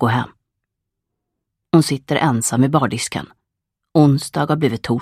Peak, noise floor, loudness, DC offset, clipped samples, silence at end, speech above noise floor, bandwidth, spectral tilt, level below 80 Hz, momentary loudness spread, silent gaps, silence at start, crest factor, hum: 0 dBFS; -80 dBFS; -17 LUFS; under 0.1%; under 0.1%; 0 s; 63 dB; 15.5 kHz; -5.5 dB/octave; -54 dBFS; 8 LU; none; 0 s; 18 dB; none